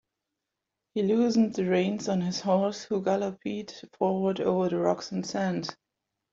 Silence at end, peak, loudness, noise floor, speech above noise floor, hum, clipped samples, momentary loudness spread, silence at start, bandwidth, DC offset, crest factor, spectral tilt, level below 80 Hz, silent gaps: 0.6 s; -10 dBFS; -28 LUFS; -86 dBFS; 59 dB; none; under 0.1%; 11 LU; 0.95 s; 7.6 kHz; under 0.1%; 18 dB; -6 dB/octave; -70 dBFS; none